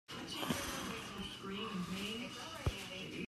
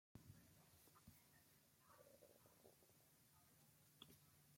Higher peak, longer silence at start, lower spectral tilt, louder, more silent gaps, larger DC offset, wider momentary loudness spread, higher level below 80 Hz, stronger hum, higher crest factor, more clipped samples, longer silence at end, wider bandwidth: first, -24 dBFS vs -46 dBFS; about the same, 0.1 s vs 0.15 s; about the same, -4 dB/octave vs -4 dB/octave; first, -42 LUFS vs -68 LUFS; neither; neither; first, 6 LU vs 3 LU; first, -56 dBFS vs -88 dBFS; neither; second, 20 dB vs 26 dB; neither; about the same, 0 s vs 0 s; about the same, 15 kHz vs 16.5 kHz